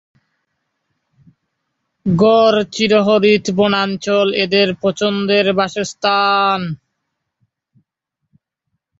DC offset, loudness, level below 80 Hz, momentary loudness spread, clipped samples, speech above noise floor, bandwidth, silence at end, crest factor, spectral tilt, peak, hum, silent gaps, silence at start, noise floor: under 0.1%; -14 LUFS; -56 dBFS; 7 LU; under 0.1%; 62 dB; 7.8 kHz; 2.25 s; 16 dB; -5 dB/octave; -2 dBFS; none; none; 2.05 s; -76 dBFS